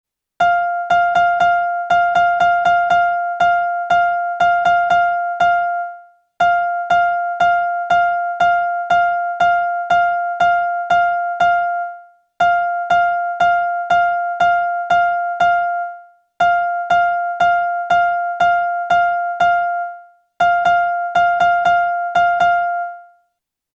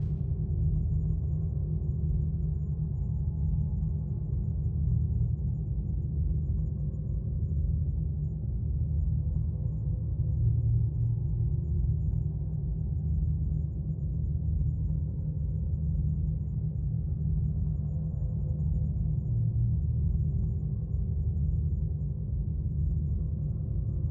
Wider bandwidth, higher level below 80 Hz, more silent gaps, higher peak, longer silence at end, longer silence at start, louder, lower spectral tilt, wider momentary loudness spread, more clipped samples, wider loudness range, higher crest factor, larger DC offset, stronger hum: first, 7.2 kHz vs 1.2 kHz; second, -54 dBFS vs -34 dBFS; neither; first, -4 dBFS vs -16 dBFS; first, 0.75 s vs 0 s; first, 0.4 s vs 0 s; first, -16 LUFS vs -31 LUFS; second, -3.5 dB/octave vs -14.5 dB/octave; about the same, 4 LU vs 4 LU; neither; about the same, 2 LU vs 2 LU; about the same, 12 dB vs 12 dB; neither; neither